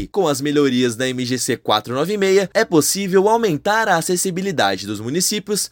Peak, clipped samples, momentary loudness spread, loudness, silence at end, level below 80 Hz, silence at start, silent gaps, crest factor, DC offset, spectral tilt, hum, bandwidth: -2 dBFS; under 0.1%; 5 LU; -18 LUFS; 0.05 s; -54 dBFS; 0 s; none; 16 dB; under 0.1%; -3.5 dB/octave; none; 17 kHz